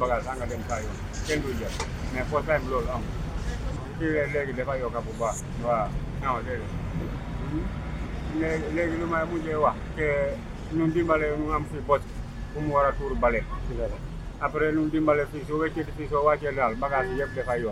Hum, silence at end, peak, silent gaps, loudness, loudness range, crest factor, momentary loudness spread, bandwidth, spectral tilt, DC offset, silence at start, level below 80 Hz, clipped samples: none; 0 s; -8 dBFS; none; -28 LUFS; 4 LU; 20 dB; 9 LU; 15.5 kHz; -6.5 dB/octave; under 0.1%; 0 s; -36 dBFS; under 0.1%